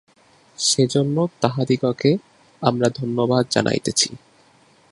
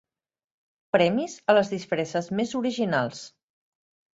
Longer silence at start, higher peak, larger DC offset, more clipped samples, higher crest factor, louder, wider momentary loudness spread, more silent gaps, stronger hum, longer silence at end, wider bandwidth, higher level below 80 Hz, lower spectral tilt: second, 0.6 s vs 0.95 s; first, 0 dBFS vs -6 dBFS; neither; neither; about the same, 22 dB vs 20 dB; first, -20 LUFS vs -25 LUFS; second, 5 LU vs 8 LU; neither; neither; second, 0.75 s vs 0.9 s; first, 11.5 kHz vs 8 kHz; first, -58 dBFS vs -68 dBFS; about the same, -4.5 dB/octave vs -5.5 dB/octave